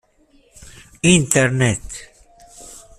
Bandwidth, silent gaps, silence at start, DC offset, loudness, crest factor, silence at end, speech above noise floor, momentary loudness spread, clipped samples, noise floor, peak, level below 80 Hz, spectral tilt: 15 kHz; none; 1.05 s; under 0.1%; -16 LUFS; 20 dB; 0.2 s; 39 dB; 23 LU; under 0.1%; -56 dBFS; 0 dBFS; -44 dBFS; -4 dB/octave